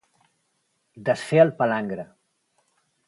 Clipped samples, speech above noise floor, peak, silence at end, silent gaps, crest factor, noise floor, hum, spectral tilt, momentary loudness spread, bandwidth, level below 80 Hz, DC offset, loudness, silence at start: under 0.1%; 51 dB; -4 dBFS; 1.05 s; none; 22 dB; -72 dBFS; none; -6.5 dB/octave; 16 LU; 11.5 kHz; -68 dBFS; under 0.1%; -22 LUFS; 0.95 s